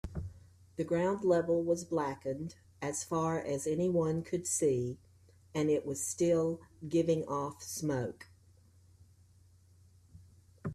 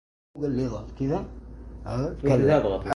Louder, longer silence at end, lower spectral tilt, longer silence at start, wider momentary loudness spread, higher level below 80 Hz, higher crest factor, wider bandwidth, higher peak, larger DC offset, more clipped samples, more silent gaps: second, -34 LUFS vs -26 LUFS; about the same, 0 s vs 0 s; second, -5.5 dB/octave vs -8 dB/octave; second, 0.05 s vs 0.35 s; second, 14 LU vs 20 LU; second, -60 dBFS vs -42 dBFS; about the same, 18 dB vs 18 dB; first, 14.5 kHz vs 11.5 kHz; second, -18 dBFS vs -8 dBFS; neither; neither; neither